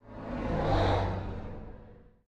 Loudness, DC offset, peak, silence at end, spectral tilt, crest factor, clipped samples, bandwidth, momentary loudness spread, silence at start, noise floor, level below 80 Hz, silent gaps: -32 LUFS; under 0.1%; -16 dBFS; 0.2 s; -7.5 dB/octave; 16 dB; under 0.1%; 8 kHz; 20 LU; 0.05 s; -53 dBFS; -40 dBFS; none